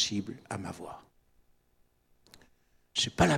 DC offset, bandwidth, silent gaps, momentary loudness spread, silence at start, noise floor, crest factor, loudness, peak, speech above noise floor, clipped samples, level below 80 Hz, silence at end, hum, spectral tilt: under 0.1%; 16 kHz; none; 17 LU; 0 s; -69 dBFS; 24 dB; -33 LUFS; -10 dBFS; 38 dB; under 0.1%; -54 dBFS; 0 s; none; -4 dB/octave